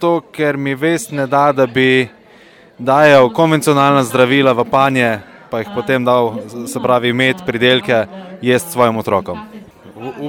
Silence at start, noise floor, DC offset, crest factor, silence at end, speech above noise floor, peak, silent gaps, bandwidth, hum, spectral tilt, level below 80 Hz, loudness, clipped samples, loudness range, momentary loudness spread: 0 s; -44 dBFS; under 0.1%; 14 dB; 0 s; 30 dB; 0 dBFS; none; 18 kHz; none; -5 dB/octave; -54 dBFS; -14 LUFS; under 0.1%; 3 LU; 13 LU